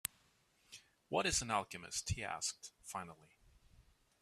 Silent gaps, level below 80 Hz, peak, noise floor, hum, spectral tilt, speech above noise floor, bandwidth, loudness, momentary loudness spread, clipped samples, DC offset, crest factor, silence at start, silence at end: none; -60 dBFS; -14 dBFS; -74 dBFS; none; -2.5 dB/octave; 33 dB; 15 kHz; -40 LUFS; 23 LU; under 0.1%; under 0.1%; 30 dB; 0.05 s; 0.4 s